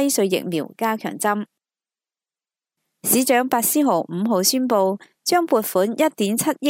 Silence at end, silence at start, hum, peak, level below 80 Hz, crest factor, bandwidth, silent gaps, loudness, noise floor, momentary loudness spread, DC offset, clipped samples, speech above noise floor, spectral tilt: 0 s; 0 s; none; -2 dBFS; -74 dBFS; 18 dB; 16 kHz; none; -20 LUFS; under -90 dBFS; 7 LU; under 0.1%; under 0.1%; over 70 dB; -3.5 dB/octave